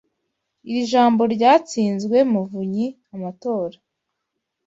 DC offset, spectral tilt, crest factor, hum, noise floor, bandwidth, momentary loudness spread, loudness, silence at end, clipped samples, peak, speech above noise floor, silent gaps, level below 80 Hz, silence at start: under 0.1%; -6 dB/octave; 18 dB; none; -79 dBFS; 8 kHz; 13 LU; -19 LUFS; 0.95 s; under 0.1%; -4 dBFS; 60 dB; none; -66 dBFS; 0.65 s